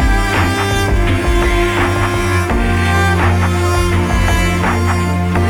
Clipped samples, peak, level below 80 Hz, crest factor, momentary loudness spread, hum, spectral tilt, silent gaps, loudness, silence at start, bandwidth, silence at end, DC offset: under 0.1%; -2 dBFS; -20 dBFS; 10 dB; 2 LU; none; -5.5 dB/octave; none; -14 LUFS; 0 s; 18 kHz; 0 s; under 0.1%